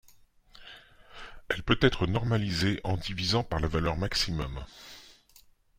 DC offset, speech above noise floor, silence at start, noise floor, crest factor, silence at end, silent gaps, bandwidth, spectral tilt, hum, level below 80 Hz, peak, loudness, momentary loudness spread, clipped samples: under 0.1%; 31 dB; 0.55 s; -60 dBFS; 24 dB; 0.65 s; none; 16 kHz; -5 dB/octave; none; -44 dBFS; -6 dBFS; -29 LUFS; 22 LU; under 0.1%